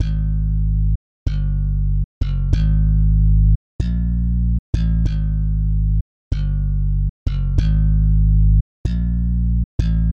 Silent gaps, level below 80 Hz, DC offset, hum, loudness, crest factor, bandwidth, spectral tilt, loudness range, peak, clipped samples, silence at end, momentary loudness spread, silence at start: 0.96-1.26 s, 2.04-2.21 s, 3.55-3.79 s, 4.59-4.73 s, 6.01-6.31 s, 7.09-7.26 s, 8.61-8.84 s, 9.64-9.79 s; -18 dBFS; under 0.1%; none; -20 LUFS; 10 dB; 4.9 kHz; -9 dB/octave; 2 LU; -6 dBFS; under 0.1%; 0 s; 7 LU; 0 s